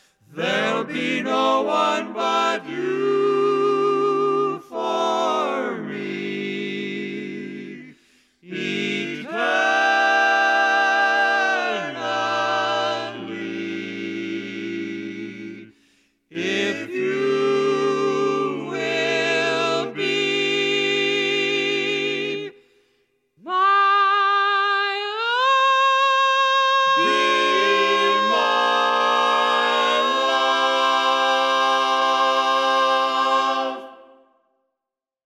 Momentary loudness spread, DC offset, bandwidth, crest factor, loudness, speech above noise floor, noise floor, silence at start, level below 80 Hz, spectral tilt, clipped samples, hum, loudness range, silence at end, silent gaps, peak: 12 LU; under 0.1%; 12.5 kHz; 14 dB; -20 LUFS; 65 dB; -86 dBFS; 0.3 s; -78 dBFS; -3 dB/octave; under 0.1%; none; 9 LU; 1.25 s; none; -8 dBFS